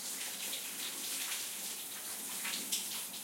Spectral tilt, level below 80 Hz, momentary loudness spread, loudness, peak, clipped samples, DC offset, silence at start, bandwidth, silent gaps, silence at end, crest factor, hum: 1 dB/octave; under -90 dBFS; 4 LU; -37 LUFS; -20 dBFS; under 0.1%; under 0.1%; 0 s; 16.5 kHz; none; 0 s; 20 dB; none